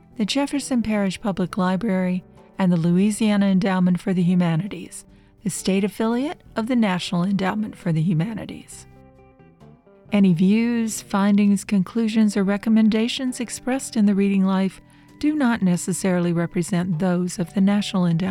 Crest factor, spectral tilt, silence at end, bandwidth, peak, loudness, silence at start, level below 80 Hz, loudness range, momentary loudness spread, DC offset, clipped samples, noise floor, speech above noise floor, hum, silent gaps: 14 dB; -6 dB/octave; 0 s; 13.5 kHz; -8 dBFS; -21 LUFS; 0.2 s; -54 dBFS; 4 LU; 9 LU; under 0.1%; under 0.1%; -50 dBFS; 30 dB; none; none